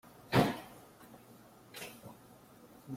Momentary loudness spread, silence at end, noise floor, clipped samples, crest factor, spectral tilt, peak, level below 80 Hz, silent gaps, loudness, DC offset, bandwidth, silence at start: 27 LU; 0 s; -58 dBFS; under 0.1%; 26 dB; -6 dB/octave; -14 dBFS; -66 dBFS; none; -35 LUFS; under 0.1%; 16.5 kHz; 0.3 s